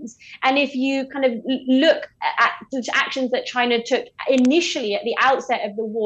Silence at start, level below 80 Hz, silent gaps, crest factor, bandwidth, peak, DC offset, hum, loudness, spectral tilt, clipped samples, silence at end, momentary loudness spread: 0 s; -68 dBFS; none; 16 dB; 8.4 kHz; -4 dBFS; under 0.1%; none; -20 LUFS; -3 dB/octave; under 0.1%; 0 s; 7 LU